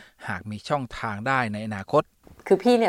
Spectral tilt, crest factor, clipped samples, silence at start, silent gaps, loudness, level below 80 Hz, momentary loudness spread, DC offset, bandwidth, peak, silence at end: -6 dB/octave; 18 dB; under 0.1%; 0 s; none; -26 LUFS; -56 dBFS; 11 LU; under 0.1%; 15.5 kHz; -6 dBFS; 0 s